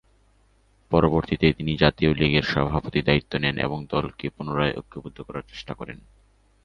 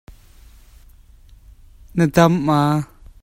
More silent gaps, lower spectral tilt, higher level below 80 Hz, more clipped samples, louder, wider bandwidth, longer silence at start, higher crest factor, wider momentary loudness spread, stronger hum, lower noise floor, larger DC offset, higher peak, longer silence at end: neither; about the same, -7.5 dB/octave vs -7 dB/octave; about the same, -40 dBFS vs -44 dBFS; neither; second, -23 LUFS vs -17 LUFS; second, 6.8 kHz vs 16 kHz; second, 0.9 s vs 1.95 s; about the same, 24 dB vs 20 dB; first, 16 LU vs 12 LU; neither; first, -61 dBFS vs -46 dBFS; neither; about the same, -2 dBFS vs 0 dBFS; first, 0.7 s vs 0.4 s